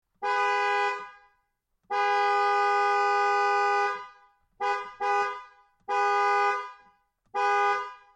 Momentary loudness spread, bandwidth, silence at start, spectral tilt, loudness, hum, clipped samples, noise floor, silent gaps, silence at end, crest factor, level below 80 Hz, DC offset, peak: 11 LU; 9 kHz; 0.2 s; -0.5 dB/octave; -26 LUFS; none; under 0.1%; -75 dBFS; none; 0.2 s; 12 dB; -76 dBFS; under 0.1%; -14 dBFS